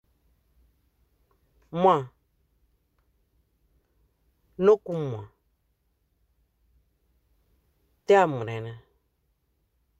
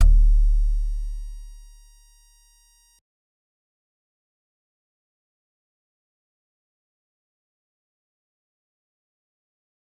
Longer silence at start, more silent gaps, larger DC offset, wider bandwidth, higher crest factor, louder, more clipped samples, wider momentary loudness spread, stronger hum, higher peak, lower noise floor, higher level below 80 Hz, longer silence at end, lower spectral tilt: first, 1.75 s vs 0 s; neither; neither; first, 8.2 kHz vs 1.4 kHz; about the same, 22 dB vs 20 dB; about the same, -24 LUFS vs -24 LUFS; neither; second, 20 LU vs 23 LU; neither; about the same, -8 dBFS vs -6 dBFS; first, -73 dBFS vs -58 dBFS; second, -66 dBFS vs -26 dBFS; second, 1.2 s vs 8.45 s; about the same, -7 dB/octave vs -6.5 dB/octave